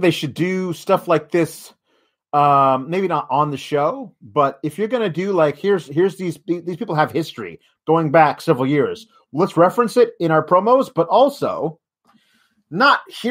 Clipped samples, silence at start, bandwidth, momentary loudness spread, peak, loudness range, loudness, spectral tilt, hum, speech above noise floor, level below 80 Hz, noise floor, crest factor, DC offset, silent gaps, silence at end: under 0.1%; 0 s; 16 kHz; 11 LU; 0 dBFS; 4 LU; -18 LUFS; -6.5 dB/octave; none; 47 dB; -66 dBFS; -65 dBFS; 18 dB; under 0.1%; none; 0 s